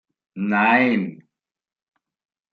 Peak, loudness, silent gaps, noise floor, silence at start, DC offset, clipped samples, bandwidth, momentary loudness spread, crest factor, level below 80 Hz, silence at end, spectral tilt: -4 dBFS; -19 LUFS; none; -73 dBFS; 0.35 s; under 0.1%; under 0.1%; 5.2 kHz; 13 LU; 20 dB; -72 dBFS; 1.4 s; -8 dB/octave